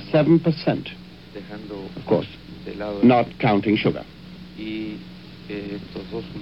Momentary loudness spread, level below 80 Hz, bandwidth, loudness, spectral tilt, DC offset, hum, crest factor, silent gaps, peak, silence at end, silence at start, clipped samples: 23 LU; -50 dBFS; 6 kHz; -22 LUFS; -9 dB/octave; 0.2%; none; 18 dB; none; -4 dBFS; 0 s; 0 s; under 0.1%